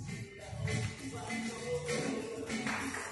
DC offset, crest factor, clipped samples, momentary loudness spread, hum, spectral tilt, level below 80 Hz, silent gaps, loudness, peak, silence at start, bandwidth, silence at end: under 0.1%; 14 dB; under 0.1%; 7 LU; none; -4.5 dB/octave; -58 dBFS; none; -38 LUFS; -24 dBFS; 0 s; 11.5 kHz; 0 s